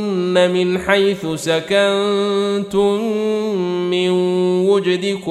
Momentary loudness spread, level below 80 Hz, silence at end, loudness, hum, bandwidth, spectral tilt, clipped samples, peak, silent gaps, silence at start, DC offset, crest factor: 4 LU; -54 dBFS; 0 s; -17 LUFS; none; 13 kHz; -5.5 dB/octave; under 0.1%; -2 dBFS; none; 0 s; under 0.1%; 16 dB